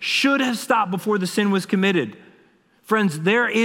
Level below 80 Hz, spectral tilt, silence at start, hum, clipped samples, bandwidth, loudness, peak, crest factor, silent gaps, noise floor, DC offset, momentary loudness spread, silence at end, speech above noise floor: -74 dBFS; -5 dB/octave; 0 s; none; under 0.1%; 16.5 kHz; -20 LUFS; -4 dBFS; 16 dB; none; -57 dBFS; under 0.1%; 5 LU; 0 s; 37 dB